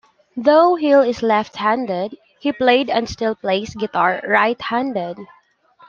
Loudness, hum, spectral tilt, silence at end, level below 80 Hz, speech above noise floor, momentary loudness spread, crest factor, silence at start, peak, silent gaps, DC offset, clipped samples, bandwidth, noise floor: -18 LUFS; none; -5 dB/octave; 0.65 s; -54 dBFS; 34 dB; 12 LU; 16 dB; 0.35 s; -2 dBFS; none; under 0.1%; under 0.1%; 7.2 kHz; -52 dBFS